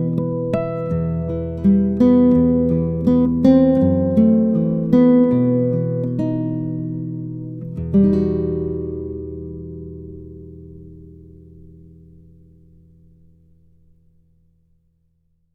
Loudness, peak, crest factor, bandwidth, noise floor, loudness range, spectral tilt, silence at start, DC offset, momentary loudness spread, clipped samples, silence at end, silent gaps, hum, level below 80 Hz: -18 LUFS; -2 dBFS; 18 dB; 4.8 kHz; -63 dBFS; 17 LU; -11.5 dB/octave; 0 s; under 0.1%; 19 LU; under 0.1%; 4.45 s; none; none; -40 dBFS